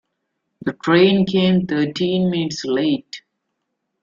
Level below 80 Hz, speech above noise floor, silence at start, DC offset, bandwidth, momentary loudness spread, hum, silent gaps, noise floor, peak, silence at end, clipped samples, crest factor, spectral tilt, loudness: -56 dBFS; 58 dB; 0.65 s; under 0.1%; 7.4 kHz; 14 LU; none; none; -75 dBFS; -2 dBFS; 0.85 s; under 0.1%; 16 dB; -6.5 dB/octave; -18 LUFS